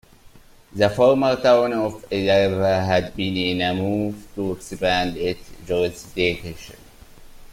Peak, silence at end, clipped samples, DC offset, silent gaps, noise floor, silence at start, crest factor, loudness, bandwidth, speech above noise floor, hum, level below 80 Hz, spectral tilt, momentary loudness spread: -2 dBFS; 0 s; under 0.1%; under 0.1%; none; -48 dBFS; 0.25 s; 18 dB; -21 LUFS; 16.5 kHz; 27 dB; none; -46 dBFS; -5.5 dB/octave; 12 LU